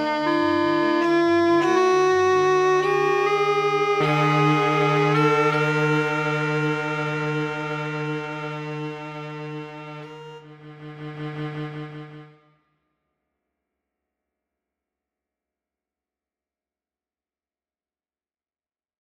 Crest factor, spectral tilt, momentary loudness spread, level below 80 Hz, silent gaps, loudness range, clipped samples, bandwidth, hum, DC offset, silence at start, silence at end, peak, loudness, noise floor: 16 dB; -6 dB/octave; 18 LU; -68 dBFS; none; 18 LU; under 0.1%; 9.6 kHz; none; under 0.1%; 0 s; 6.85 s; -8 dBFS; -21 LUFS; under -90 dBFS